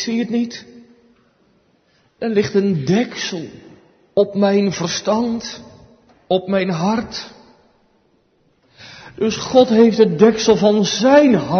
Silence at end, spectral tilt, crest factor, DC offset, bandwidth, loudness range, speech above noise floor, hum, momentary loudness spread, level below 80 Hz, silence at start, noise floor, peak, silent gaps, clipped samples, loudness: 0 s; -5.5 dB/octave; 18 dB; under 0.1%; 6.6 kHz; 8 LU; 44 dB; none; 18 LU; -56 dBFS; 0 s; -59 dBFS; 0 dBFS; none; under 0.1%; -16 LUFS